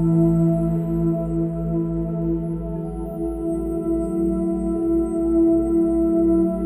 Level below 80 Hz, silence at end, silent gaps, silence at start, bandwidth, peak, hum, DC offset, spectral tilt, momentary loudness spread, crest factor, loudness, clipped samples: -34 dBFS; 0 s; none; 0 s; 8.8 kHz; -10 dBFS; none; under 0.1%; -11.5 dB/octave; 9 LU; 12 dB; -21 LUFS; under 0.1%